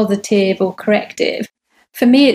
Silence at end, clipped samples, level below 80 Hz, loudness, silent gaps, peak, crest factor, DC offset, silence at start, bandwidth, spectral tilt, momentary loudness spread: 0 s; under 0.1%; -64 dBFS; -15 LUFS; none; 0 dBFS; 14 dB; under 0.1%; 0 s; 15.5 kHz; -5 dB/octave; 14 LU